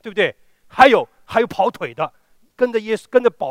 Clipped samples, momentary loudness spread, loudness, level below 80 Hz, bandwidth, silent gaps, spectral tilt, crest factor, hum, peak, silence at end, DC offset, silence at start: under 0.1%; 13 LU; -18 LUFS; -56 dBFS; 15.5 kHz; none; -5 dB/octave; 18 dB; none; 0 dBFS; 0 s; under 0.1%; 0.05 s